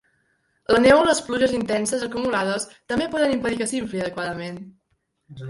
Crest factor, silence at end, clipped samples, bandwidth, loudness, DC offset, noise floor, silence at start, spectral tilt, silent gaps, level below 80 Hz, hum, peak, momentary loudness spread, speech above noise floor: 20 dB; 0 s; under 0.1%; 11.5 kHz; -22 LUFS; under 0.1%; -71 dBFS; 0.7 s; -4 dB/octave; none; -52 dBFS; none; -4 dBFS; 14 LU; 50 dB